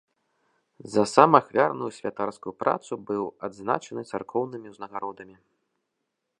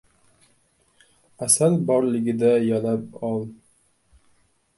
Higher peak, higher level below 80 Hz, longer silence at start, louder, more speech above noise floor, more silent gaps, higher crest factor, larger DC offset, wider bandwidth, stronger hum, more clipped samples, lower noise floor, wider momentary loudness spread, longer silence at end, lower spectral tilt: first, 0 dBFS vs -4 dBFS; second, -70 dBFS vs -64 dBFS; second, 0.85 s vs 1.4 s; second, -25 LUFS vs -21 LUFS; first, 55 dB vs 42 dB; neither; first, 26 dB vs 20 dB; neither; about the same, 11.5 kHz vs 12 kHz; neither; neither; first, -81 dBFS vs -64 dBFS; first, 16 LU vs 12 LU; about the same, 1.15 s vs 1.25 s; about the same, -5.5 dB/octave vs -5.5 dB/octave